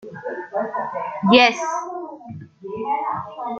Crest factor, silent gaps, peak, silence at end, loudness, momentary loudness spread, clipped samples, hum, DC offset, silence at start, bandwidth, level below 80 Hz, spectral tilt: 20 dB; none; -2 dBFS; 0 s; -20 LUFS; 21 LU; under 0.1%; none; under 0.1%; 0 s; 7.8 kHz; -66 dBFS; -4.5 dB/octave